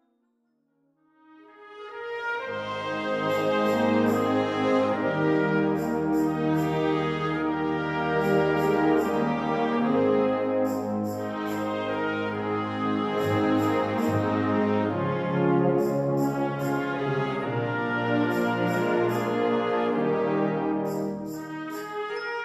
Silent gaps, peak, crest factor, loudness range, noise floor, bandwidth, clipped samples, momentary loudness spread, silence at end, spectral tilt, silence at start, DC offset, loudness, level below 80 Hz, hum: none; -12 dBFS; 14 dB; 3 LU; -71 dBFS; 13 kHz; under 0.1%; 8 LU; 0 s; -7 dB/octave; 1.6 s; under 0.1%; -26 LUFS; -60 dBFS; none